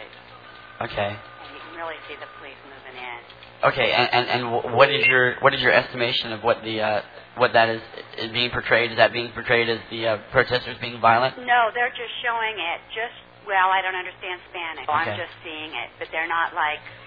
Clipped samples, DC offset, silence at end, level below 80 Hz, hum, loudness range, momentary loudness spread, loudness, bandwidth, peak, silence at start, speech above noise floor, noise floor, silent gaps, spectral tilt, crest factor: under 0.1%; under 0.1%; 0 s; -56 dBFS; none; 7 LU; 19 LU; -22 LUFS; 5 kHz; 0 dBFS; 0 s; 21 dB; -44 dBFS; none; -6.5 dB/octave; 22 dB